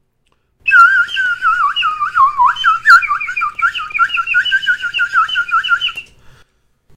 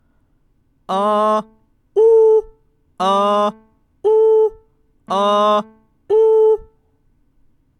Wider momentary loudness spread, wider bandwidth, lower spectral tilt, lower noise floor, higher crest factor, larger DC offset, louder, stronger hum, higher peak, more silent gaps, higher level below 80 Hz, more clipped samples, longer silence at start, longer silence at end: about the same, 9 LU vs 10 LU; first, 15 kHz vs 9.6 kHz; second, 1.5 dB/octave vs -5.5 dB/octave; about the same, -61 dBFS vs -59 dBFS; about the same, 14 dB vs 12 dB; neither; first, -12 LUFS vs -15 LUFS; neither; first, 0 dBFS vs -4 dBFS; neither; about the same, -50 dBFS vs -54 dBFS; first, 0.2% vs under 0.1%; second, 0.65 s vs 0.9 s; second, 0.95 s vs 1.15 s